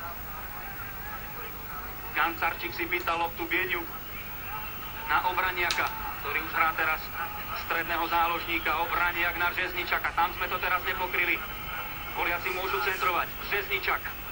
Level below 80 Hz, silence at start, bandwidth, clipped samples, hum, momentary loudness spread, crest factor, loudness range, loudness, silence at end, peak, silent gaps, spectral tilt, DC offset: -48 dBFS; 0 s; 16.5 kHz; under 0.1%; none; 10 LU; 24 dB; 3 LU; -29 LUFS; 0 s; -6 dBFS; none; -3.5 dB/octave; under 0.1%